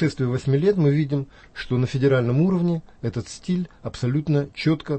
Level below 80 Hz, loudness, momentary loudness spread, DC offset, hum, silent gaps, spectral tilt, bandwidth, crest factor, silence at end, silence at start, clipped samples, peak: -50 dBFS; -23 LUFS; 10 LU; under 0.1%; none; none; -8 dB/octave; 8.6 kHz; 14 dB; 0 s; 0 s; under 0.1%; -8 dBFS